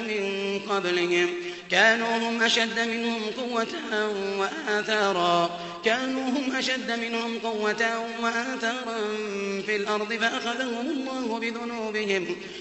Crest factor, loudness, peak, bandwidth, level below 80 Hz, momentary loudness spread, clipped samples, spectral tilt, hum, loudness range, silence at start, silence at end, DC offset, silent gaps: 20 dB; -26 LUFS; -8 dBFS; 8.4 kHz; -70 dBFS; 7 LU; under 0.1%; -3 dB/octave; none; 4 LU; 0 s; 0 s; under 0.1%; none